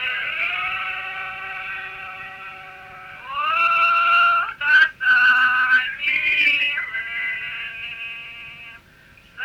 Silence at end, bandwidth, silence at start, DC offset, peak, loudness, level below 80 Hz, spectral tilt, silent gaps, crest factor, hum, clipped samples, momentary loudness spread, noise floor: 0 s; 15.5 kHz; 0 s; under 0.1%; -4 dBFS; -18 LUFS; -60 dBFS; -1.5 dB/octave; none; 18 dB; none; under 0.1%; 20 LU; -50 dBFS